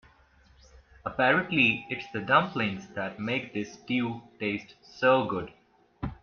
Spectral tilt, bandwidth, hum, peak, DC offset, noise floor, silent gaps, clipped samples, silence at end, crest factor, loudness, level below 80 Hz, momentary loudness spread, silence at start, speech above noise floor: -6 dB/octave; 6.8 kHz; none; -8 dBFS; under 0.1%; -60 dBFS; none; under 0.1%; 0.1 s; 22 dB; -28 LUFS; -56 dBFS; 14 LU; 1.05 s; 32 dB